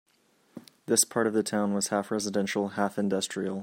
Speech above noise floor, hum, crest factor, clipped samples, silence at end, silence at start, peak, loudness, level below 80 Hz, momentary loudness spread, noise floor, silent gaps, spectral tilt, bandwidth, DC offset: 39 dB; none; 20 dB; under 0.1%; 0 s; 0.55 s; -8 dBFS; -28 LUFS; -74 dBFS; 6 LU; -66 dBFS; none; -3.5 dB/octave; 16 kHz; under 0.1%